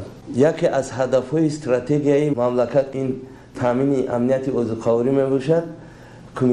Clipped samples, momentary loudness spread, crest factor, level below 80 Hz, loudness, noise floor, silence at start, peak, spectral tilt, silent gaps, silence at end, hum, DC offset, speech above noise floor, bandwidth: under 0.1%; 9 LU; 16 dB; -52 dBFS; -20 LUFS; -41 dBFS; 0 s; -4 dBFS; -7.5 dB/octave; none; 0 s; none; under 0.1%; 22 dB; 11 kHz